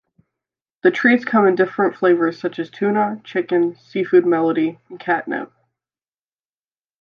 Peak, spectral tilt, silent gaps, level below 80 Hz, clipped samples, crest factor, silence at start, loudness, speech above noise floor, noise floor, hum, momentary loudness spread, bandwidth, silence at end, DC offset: -2 dBFS; -7.5 dB/octave; none; -74 dBFS; under 0.1%; 18 dB; 0.85 s; -18 LUFS; over 72 dB; under -90 dBFS; none; 11 LU; 6.6 kHz; 1.55 s; under 0.1%